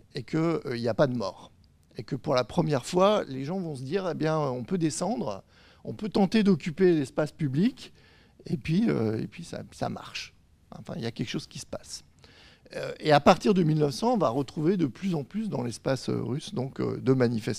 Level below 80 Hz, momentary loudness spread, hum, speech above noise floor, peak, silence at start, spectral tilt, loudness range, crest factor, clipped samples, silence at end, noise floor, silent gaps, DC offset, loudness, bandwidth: -58 dBFS; 16 LU; none; 28 dB; -6 dBFS; 0.15 s; -6.5 dB/octave; 7 LU; 22 dB; under 0.1%; 0 s; -55 dBFS; none; under 0.1%; -28 LUFS; 14.5 kHz